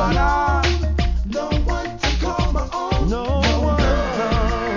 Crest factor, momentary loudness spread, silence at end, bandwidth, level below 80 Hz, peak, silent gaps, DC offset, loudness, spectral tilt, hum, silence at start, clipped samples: 12 dB; 5 LU; 0 s; 7.4 kHz; -22 dBFS; -6 dBFS; none; under 0.1%; -20 LUFS; -6 dB/octave; none; 0 s; under 0.1%